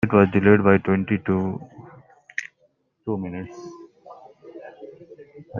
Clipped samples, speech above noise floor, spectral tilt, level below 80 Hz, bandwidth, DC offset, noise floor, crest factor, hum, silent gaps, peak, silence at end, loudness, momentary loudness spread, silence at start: under 0.1%; 46 dB; -8.5 dB/octave; -58 dBFS; 7 kHz; under 0.1%; -65 dBFS; 22 dB; none; none; -2 dBFS; 0 s; -21 LUFS; 26 LU; 0 s